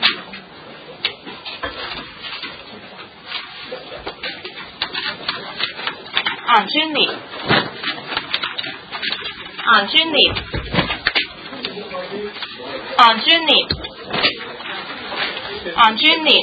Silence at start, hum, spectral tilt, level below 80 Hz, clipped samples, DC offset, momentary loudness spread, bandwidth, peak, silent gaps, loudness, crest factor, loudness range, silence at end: 0 s; none; -5 dB/octave; -46 dBFS; under 0.1%; under 0.1%; 19 LU; 8 kHz; 0 dBFS; none; -18 LUFS; 20 dB; 12 LU; 0 s